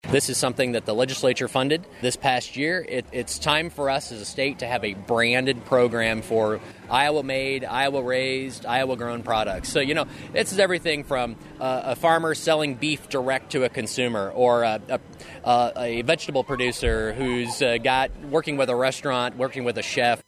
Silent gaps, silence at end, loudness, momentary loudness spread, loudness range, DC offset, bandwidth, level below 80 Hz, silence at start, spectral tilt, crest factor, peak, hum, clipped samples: none; 0.05 s; -24 LUFS; 6 LU; 2 LU; under 0.1%; 15 kHz; -46 dBFS; 0.05 s; -4 dB/octave; 20 dB; -4 dBFS; none; under 0.1%